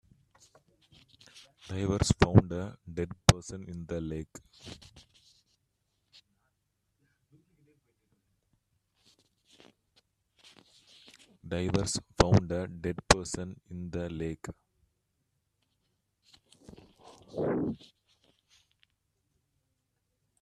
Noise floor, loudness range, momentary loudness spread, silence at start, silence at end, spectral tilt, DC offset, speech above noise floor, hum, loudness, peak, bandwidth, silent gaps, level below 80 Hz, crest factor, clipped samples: -80 dBFS; 15 LU; 23 LU; 1.35 s; 2.65 s; -5 dB/octave; under 0.1%; 50 dB; none; -30 LUFS; 0 dBFS; 13 kHz; none; -50 dBFS; 34 dB; under 0.1%